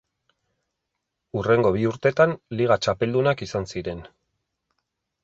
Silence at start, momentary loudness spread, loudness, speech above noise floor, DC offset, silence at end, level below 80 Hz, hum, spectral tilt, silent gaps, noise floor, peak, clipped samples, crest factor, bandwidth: 1.35 s; 12 LU; -23 LUFS; 59 dB; under 0.1%; 1.15 s; -52 dBFS; none; -6.5 dB/octave; none; -81 dBFS; -6 dBFS; under 0.1%; 20 dB; 8 kHz